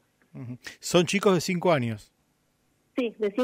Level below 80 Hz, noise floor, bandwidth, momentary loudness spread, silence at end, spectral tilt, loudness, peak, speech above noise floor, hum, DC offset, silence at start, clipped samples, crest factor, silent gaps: -66 dBFS; -70 dBFS; 16 kHz; 17 LU; 0 s; -5 dB/octave; -25 LUFS; -8 dBFS; 44 dB; none; under 0.1%; 0.35 s; under 0.1%; 20 dB; none